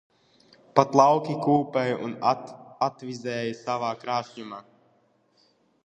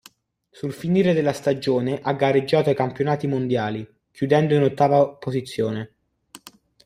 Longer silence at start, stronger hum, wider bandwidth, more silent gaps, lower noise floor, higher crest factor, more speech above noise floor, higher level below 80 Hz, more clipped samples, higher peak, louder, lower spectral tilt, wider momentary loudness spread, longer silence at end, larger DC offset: about the same, 0.75 s vs 0.65 s; neither; second, 9.2 kHz vs 15 kHz; neither; first, -65 dBFS vs -60 dBFS; first, 24 dB vs 18 dB; about the same, 41 dB vs 39 dB; second, -68 dBFS vs -60 dBFS; neither; about the same, -2 dBFS vs -4 dBFS; second, -25 LUFS vs -21 LUFS; about the same, -6 dB/octave vs -7 dB/octave; first, 19 LU vs 13 LU; first, 1.25 s vs 0.5 s; neither